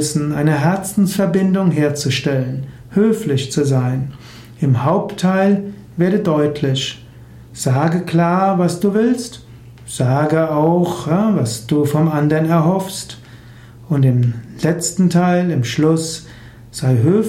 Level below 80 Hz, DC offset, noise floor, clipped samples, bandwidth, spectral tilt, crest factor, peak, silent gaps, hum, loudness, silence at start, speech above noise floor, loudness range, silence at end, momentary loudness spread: -50 dBFS; under 0.1%; -39 dBFS; under 0.1%; 16 kHz; -6.5 dB/octave; 14 dB; -4 dBFS; none; none; -16 LUFS; 0 s; 23 dB; 1 LU; 0 s; 11 LU